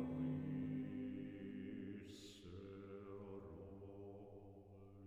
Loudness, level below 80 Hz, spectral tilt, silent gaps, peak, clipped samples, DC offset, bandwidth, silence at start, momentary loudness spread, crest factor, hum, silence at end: -51 LUFS; -72 dBFS; -8 dB/octave; none; -34 dBFS; under 0.1%; under 0.1%; 10.5 kHz; 0 s; 14 LU; 16 dB; none; 0 s